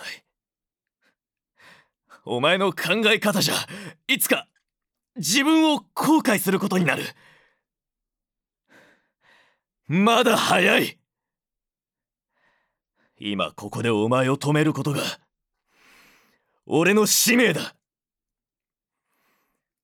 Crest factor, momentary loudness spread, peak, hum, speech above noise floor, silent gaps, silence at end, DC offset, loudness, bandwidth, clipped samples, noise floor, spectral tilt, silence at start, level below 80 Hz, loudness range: 20 dB; 13 LU; -6 dBFS; none; over 69 dB; none; 2.15 s; under 0.1%; -21 LUFS; over 20 kHz; under 0.1%; under -90 dBFS; -3.5 dB/octave; 0 s; -76 dBFS; 6 LU